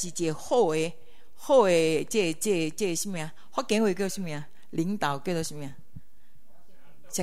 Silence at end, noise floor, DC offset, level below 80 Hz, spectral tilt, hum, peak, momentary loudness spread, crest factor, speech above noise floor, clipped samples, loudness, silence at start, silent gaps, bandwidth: 0 s; -64 dBFS; 2%; -62 dBFS; -4.5 dB/octave; none; -8 dBFS; 14 LU; 20 dB; 38 dB; under 0.1%; -27 LUFS; 0 s; none; 16 kHz